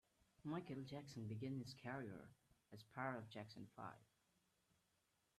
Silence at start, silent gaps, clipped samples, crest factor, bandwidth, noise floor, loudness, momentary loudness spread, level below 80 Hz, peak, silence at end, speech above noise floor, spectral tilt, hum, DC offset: 0.45 s; none; under 0.1%; 22 dB; 13.5 kHz; -85 dBFS; -53 LUFS; 13 LU; -84 dBFS; -32 dBFS; 1.35 s; 33 dB; -6.5 dB/octave; none; under 0.1%